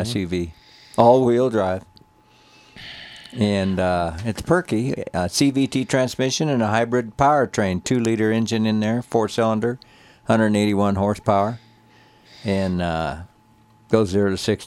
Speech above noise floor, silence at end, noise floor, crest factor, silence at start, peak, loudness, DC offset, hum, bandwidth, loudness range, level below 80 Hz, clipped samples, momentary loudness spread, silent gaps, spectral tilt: 35 dB; 0 s; -54 dBFS; 20 dB; 0 s; 0 dBFS; -20 LUFS; under 0.1%; none; 14.5 kHz; 4 LU; -48 dBFS; under 0.1%; 12 LU; none; -5.5 dB/octave